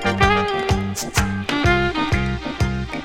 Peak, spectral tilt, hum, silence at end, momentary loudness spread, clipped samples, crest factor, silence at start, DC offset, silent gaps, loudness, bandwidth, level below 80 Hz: 0 dBFS; -5 dB/octave; none; 0 s; 6 LU; under 0.1%; 20 dB; 0 s; under 0.1%; none; -20 LUFS; 17 kHz; -30 dBFS